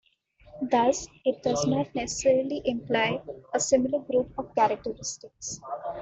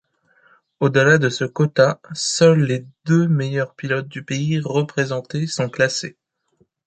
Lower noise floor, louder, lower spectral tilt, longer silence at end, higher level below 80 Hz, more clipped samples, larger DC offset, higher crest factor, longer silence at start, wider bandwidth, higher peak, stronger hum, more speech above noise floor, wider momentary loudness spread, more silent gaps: second, -58 dBFS vs -63 dBFS; second, -27 LUFS vs -19 LUFS; second, -4 dB/octave vs -5.5 dB/octave; second, 0 s vs 0.75 s; about the same, -58 dBFS vs -60 dBFS; neither; neither; about the same, 18 dB vs 18 dB; second, 0.55 s vs 0.8 s; second, 8.2 kHz vs 9.2 kHz; second, -10 dBFS vs -2 dBFS; neither; second, 31 dB vs 45 dB; about the same, 12 LU vs 10 LU; neither